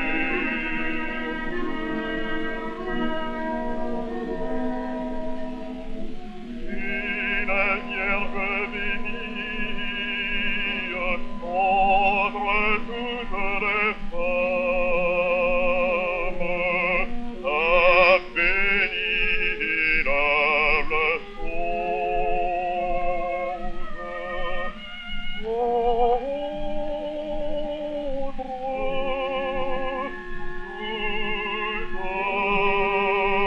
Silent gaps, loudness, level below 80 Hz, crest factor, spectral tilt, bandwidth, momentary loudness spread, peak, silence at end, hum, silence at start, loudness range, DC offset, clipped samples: none; -24 LUFS; -34 dBFS; 20 dB; -6 dB/octave; 5.6 kHz; 12 LU; -4 dBFS; 0 s; none; 0 s; 9 LU; under 0.1%; under 0.1%